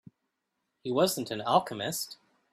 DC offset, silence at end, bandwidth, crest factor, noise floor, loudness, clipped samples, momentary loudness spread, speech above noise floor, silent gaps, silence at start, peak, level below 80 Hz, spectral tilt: under 0.1%; 0.4 s; 15.5 kHz; 24 dB; -82 dBFS; -30 LUFS; under 0.1%; 11 LU; 53 dB; none; 0.85 s; -8 dBFS; -72 dBFS; -4 dB/octave